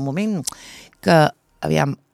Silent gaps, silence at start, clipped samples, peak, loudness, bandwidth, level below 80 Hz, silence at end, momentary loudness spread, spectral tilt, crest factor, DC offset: none; 0 s; under 0.1%; -2 dBFS; -20 LUFS; 14.5 kHz; -54 dBFS; 0.2 s; 17 LU; -5.5 dB/octave; 18 dB; under 0.1%